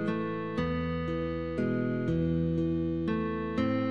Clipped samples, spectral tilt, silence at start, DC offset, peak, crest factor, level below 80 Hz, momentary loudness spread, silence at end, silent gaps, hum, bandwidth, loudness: under 0.1%; -9 dB/octave; 0 s; 0.3%; -18 dBFS; 12 dB; -52 dBFS; 4 LU; 0 s; none; none; 6.6 kHz; -31 LUFS